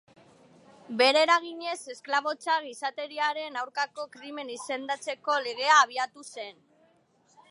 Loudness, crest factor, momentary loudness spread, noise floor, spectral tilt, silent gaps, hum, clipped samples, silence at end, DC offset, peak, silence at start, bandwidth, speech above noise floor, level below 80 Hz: -27 LUFS; 22 dB; 18 LU; -65 dBFS; -1 dB/octave; none; none; under 0.1%; 1 s; under 0.1%; -8 dBFS; 0.9 s; 11.5 kHz; 37 dB; -88 dBFS